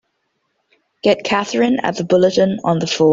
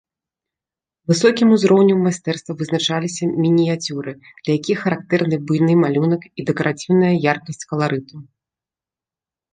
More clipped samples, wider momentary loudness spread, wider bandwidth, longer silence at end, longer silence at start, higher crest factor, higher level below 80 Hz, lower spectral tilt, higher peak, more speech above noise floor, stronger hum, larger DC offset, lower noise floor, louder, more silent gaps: neither; second, 5 LU vs 12 LU; second, 7.8 kHz vs 9.6 kHz; second, 0 s vs 1.3 s; about the same, 1.05 s vs 1.1 s; about the same, 14 dB vs 18 dB; first, -56 dBFS vs -62 dBFS; about the same, -5.5 dB/octave vs -6 dB/octave; about the same, -2 dBFS vs -2 dBFS; second, 54 dB vs 73 dB; neither; neither; second, -69 dBFS vs -90 dBFS; about the same, -16 LUFS vs -18 LUFS; neither